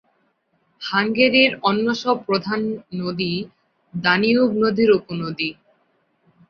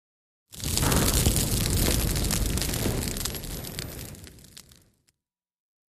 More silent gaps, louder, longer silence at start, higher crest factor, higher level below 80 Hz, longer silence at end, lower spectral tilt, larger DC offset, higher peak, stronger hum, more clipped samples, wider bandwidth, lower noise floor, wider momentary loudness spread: neither; first, -19 LUFS vs -26 LUFS; first, 0.8 s vs 0.5 s; about the same, 20 dB vs 22 dB; second, -60 dBFS vs -34 dBFS; second, 0.95 s vs 1.6 s; first, -6 dB/octave vs -3.5 dB/octave; neither; first, -2 dBFS vs -6 dBFS; neither; neither; second, 6.8 kHz vs 15.5 kHz; second, -66 dBFS vs -88 dBFS; second, 12 LU vs 19 LU